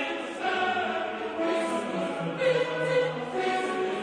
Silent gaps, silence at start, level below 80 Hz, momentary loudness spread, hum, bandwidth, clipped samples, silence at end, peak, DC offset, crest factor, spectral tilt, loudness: none; 0 s; -70 dBFS; 5 LU; none; 10 kHz; under 0.1%; 0 s; -14 dBFS; under 0.1%; 16 dB; -5 dB/octave; -28 LUFS